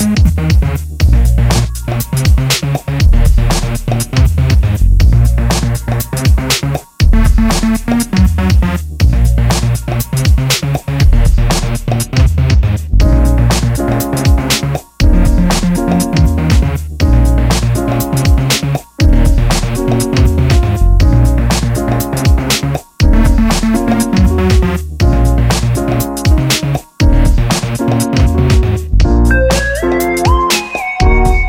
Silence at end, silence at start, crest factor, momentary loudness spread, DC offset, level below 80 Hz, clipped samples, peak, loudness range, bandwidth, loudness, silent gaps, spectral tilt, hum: 0 s; 0 s; 10 dB; 4 LU; under 0.1%; -12 dBFS; under 0.1%; 0 dBFS; 1 LU; 17 kHz; -12 LUFS; none; -5.5 dB/octave; none